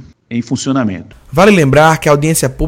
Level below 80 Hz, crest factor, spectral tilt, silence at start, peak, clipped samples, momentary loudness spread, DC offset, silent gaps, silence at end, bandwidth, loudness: -32 dBFS; 12 dB; -5.5 dB/octave; 0 s; 0 dBFS; 0.6%; 14 LU; under 0.1%; none; 0 s; 16.5 kHz; -11 LUFS